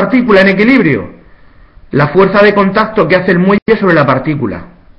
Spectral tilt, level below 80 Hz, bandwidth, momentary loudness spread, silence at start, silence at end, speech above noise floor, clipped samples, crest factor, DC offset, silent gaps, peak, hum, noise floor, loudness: -8.5 dB/octave; -38 dBFS; 6.2 kHz; 10 LU; 0 s; 0.3 s; 31 dB; 0.3%; 10 dB; under 0.1%; 3.62-3.66 s; 0 dBFS; none; -40 dBFS; -9 LUFS